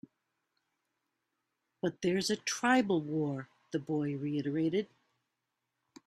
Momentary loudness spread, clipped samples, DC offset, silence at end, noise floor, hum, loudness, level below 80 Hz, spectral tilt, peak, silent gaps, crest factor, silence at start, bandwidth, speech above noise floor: 11 LU; under 0.1%; under 0.1%; 1.2 s; -86 dBFS; none; -33 LUFS; -76 dBFS; -5 dB/octave; -14 dBFS; none; 22 dB; 1.85 s; 14 kHz; 54 dB